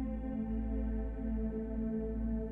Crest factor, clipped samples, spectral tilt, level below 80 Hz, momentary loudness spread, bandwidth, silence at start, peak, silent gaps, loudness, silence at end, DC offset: 10 dB; under 0.1%; -11.5 dB/octave; -40 dBFS; 2 LU; 3 kHz; 0 s; -26 dBFS; none; -38 LUFS; 0 s; under 0.1%